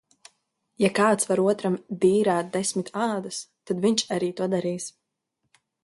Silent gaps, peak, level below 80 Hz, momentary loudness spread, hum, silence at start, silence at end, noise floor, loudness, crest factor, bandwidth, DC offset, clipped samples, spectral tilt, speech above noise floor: none; -8 dBFS; -68 dBFS; 11 LU; none; 0.8 s; 0.95 s; -79 dBFS; -24 LUFS; 18 dB; 11.5 kHz; under 0.1%; under 0.1%; -4.5 dB/octave; 55 dB